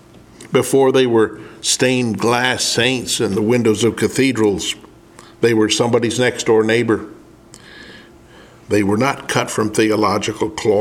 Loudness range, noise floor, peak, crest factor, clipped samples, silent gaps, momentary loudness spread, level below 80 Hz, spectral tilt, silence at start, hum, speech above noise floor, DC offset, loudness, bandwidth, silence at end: 4 LU; -43 dBFS; 0 dBFS; 18 dB; under 0.1%; none; 6 LU; -52 dBFS; -4 dB/octave; 0.4 s; none; 27 dB; under 0.1%; -16 LUFS; 17 kHz; 0 s